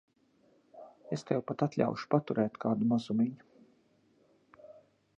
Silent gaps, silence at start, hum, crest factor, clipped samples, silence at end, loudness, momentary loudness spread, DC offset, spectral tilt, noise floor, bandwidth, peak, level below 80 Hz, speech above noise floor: none; 0.75 s; none; 22 dB; under 0.1%; 0.45 s; -32 LUFS; 23 LU; under 0.1%; -8 dB/octave; -68 dBFS; 8.2 kHz; -12 dBFS; -76 dBFS; 37 dB